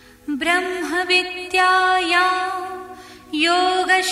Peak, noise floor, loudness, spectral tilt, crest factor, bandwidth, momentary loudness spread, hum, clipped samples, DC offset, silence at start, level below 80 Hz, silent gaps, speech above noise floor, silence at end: -4 dBFS; -39 dBFS; -18 LUFS; -1 dB/octave; 16 dB; 15 kHz; 13 LU; none; under 0.1%; under 0.1%; 0.25 s; -56 dBFS; none; 20 dB; 0 s